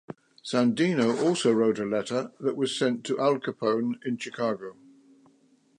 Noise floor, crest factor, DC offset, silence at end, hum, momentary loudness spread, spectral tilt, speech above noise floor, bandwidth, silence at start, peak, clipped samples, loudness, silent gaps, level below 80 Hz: -63 dBFS; 18 dB; under 0.1%; 1.05 s; none; 9 LU; -5 dB/octave; 37 dB; 11 kHz; 0.1 s; -10 dBFS; under 0.1%; -27 LUFS; none; -74 dBFS